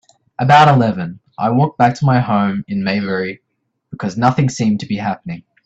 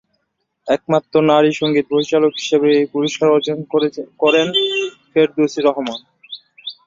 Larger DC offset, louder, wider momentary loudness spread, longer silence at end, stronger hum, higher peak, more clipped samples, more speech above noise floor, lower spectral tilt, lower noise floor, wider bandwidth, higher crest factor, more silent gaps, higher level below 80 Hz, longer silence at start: neither; about the same, -15 LUFS vs -16 LUFS; about the same, 15 LU vs 16 LU; about the same, 0.25 s vs 0.15 s; neither; about the same, 0 dBFS vs -2 dBFS; neither; second, 39 dB vs 55 dB; first, -6.5 dB/octave vs -5 dB/octave; second, -53 dBFS vs -71 dBFS; about the same, 8.2 kHz vs 7.6 kHz; about the same, 16 dB vs 16 dB; neither; first, -52 dBFS vs -62 dBFS; second, 0.4 s vs 0.65 s